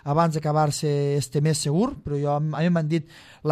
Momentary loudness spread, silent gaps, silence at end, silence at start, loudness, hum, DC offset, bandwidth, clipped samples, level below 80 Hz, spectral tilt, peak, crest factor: 5 LU; none; 0 s; 0.05 s; -24 LUFS; none; under 0.1%; 13.5 kHz; under 0.1%; -54 dBFS; -6 dB/octave; -8 dBFS; 16 dB